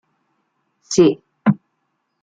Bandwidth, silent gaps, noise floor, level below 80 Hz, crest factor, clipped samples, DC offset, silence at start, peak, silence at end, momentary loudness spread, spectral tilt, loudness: 9.4 kHz; none; -72 dBFS; -60 dBFS; 18 dB; under 0.1%; under 0.1%; 0.9 s; -2 dBFS; 0.65 s; 7 LU; -6 dB/octave; -18 LUFS